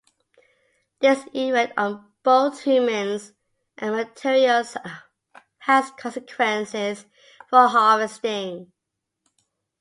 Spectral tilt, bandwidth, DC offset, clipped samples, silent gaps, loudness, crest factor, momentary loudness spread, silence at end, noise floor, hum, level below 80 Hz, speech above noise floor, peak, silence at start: -4 dB/octave; 11.5 kHz; under 0.1%; under 0.1%; none; -21 LUFS; 20 dB; 16 LU; 1.15 s; -82 dBFS; none; -74 dBFS; 61 dB; -2 dBFS; 1 s